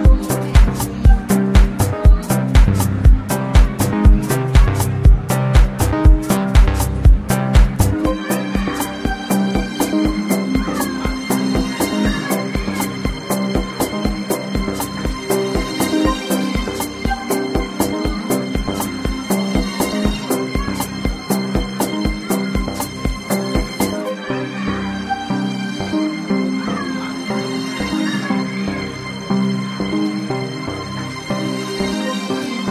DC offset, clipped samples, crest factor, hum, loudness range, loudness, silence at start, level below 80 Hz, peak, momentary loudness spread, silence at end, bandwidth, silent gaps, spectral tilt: under 0.1%; under 0.1%; 16 dB; none; 6 LU; -18 LUFS; 0 s; -20 dBFS; 0 dBFS; 8 LU; 0 s; 15.5 kHz; none; -5.5 dB/octave